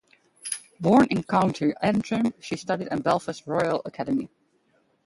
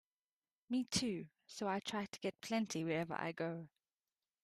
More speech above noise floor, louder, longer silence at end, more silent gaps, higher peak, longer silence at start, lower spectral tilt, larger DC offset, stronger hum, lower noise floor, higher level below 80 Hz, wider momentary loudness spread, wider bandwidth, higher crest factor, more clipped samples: second, 43 dB vs over 49 dB; first, -25 LUFS vs -41 LUFS; about the same, 0.8 s vs 0.75 s; neither; first, -6 dBFS vs -22 dBFS; second, 0.45 s vs 0.7 s; first, -6 dB/octave vs -4 dB/octave; neither; neither; second, -67 dBFS vs under -90 dBFS; first, -60 dBFS vs -76 dBFS; first, 13 LU vs 9 LU; second, 11.5 kHz vs 14 kHz; about the same, 20 dB vs 22 dB; neither